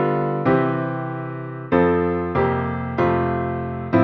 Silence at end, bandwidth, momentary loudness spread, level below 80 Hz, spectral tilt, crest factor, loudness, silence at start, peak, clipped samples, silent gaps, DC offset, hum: 0 s; 5.8 kHz; 9 LU; -44 dBFS; -10 dB/octave; 16 dB; -21 LUFS; 0 s; -4 dBFS; under 0.1%; none; under 0.1%; none